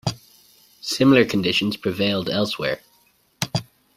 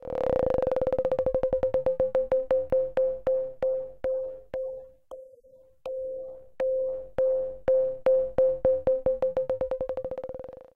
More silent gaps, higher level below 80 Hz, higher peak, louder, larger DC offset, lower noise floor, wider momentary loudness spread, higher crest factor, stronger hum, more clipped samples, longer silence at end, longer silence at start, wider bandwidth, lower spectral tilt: neither; second, -56 dBFS vs -50 dBFS; first, -2 dBFS vs -10 dBFS; first, -21 LUFS vs -28 LUFS; neither; first, -60 dBFS vs -56 dBFS; about the same, 14 LU vs 13 LU; about the same, 20 dB vs 16 dB; neither; neither; first, 0.35 s vs 0.15 s; about the same, 0.05 s vs 0.05 s; first, 16 kHz vs 4.3 kHz; second, -5 dB/octave vs -8.5 dB/octave